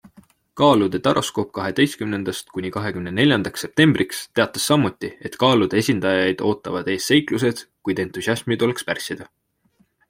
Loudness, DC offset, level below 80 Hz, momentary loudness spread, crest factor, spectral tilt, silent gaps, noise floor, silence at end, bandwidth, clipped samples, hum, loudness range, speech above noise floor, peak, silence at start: -20 LUFS; under 0.1%; -58 dBFS; 10 LU; 20 dB; -5 dB/octave; none; -63 dBFS; 0.85 s; 16.5 kHz; under 0.1%; none; 3 LU; 43 dB; -2 dBFS; 0.55 s